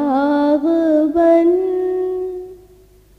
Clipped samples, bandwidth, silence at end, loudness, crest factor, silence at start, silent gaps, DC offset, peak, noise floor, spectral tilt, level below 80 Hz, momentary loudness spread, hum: under 0.1%; 6 kHz; 0.65 s; -15 LUFS; 12 dB; 0 s; none; under 0.1%; -4 dBFS; -47 dBFS; -7 dB/octave; -52 dBFS; 11 LU; 50 Hz at -50 dBFS